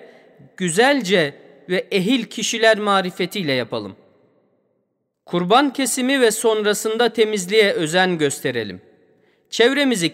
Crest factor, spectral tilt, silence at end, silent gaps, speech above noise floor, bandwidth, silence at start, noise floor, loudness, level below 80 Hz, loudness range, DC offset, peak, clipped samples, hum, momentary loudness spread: 18 dB; -3.5 dB/octave; 0 s; none; 53 dB; 16 kHz; 0 s; -71 dBFS; -18 LUFS; -72 dBFS; 4 LU; under 0.1%; -2 dBFS; under 0.1%; none; 9 LU